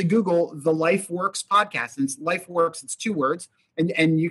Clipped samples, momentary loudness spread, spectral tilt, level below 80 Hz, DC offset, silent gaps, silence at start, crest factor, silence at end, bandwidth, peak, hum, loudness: under 0.1%; 7 LU; -5 dB/octave; -70 dBFS; under 0.1%; none; 0 s; 16 dB; 0 s; 12.5 kHz; -6 dBFS; none; -23 LUFS